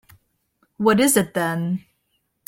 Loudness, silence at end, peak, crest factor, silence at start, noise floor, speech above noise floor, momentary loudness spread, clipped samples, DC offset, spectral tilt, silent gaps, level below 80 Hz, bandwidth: -20 LUFS; 0.7 s; -4 dBFS; 18 dB; 0.8 s; -71 dBFS; 52 dB; 11 LU; under 0.1%; under 0.1%; -4.5 dB/octave; none; -62 dBFS; 16.5 kHz